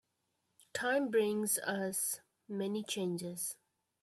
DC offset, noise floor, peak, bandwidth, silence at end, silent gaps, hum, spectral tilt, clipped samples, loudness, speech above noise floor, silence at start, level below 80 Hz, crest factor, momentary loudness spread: under 0.1%; -82 dBFS; -20 dBFS; 15.5 kHz; 0.5 s; none; none; -3.5 dB/octave; under 0.1%; -36 LUFS; 47 dB; 0.75 s; -82 dBFS; 18 dB; 11 LU